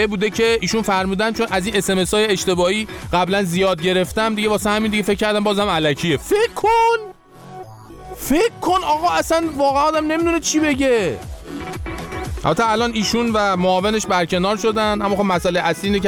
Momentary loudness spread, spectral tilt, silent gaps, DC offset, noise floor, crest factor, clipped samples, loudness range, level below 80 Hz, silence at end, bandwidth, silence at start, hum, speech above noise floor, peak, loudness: 11 LU; -4 dB/octave; none; under 0.1%; -39 dBFS; 14 dB; under 0.1%; 2 LU; -40 dBFS; 0 s; 20 kHz; 0 s; none; 21 dB; -4 dBFS; -18 LUFS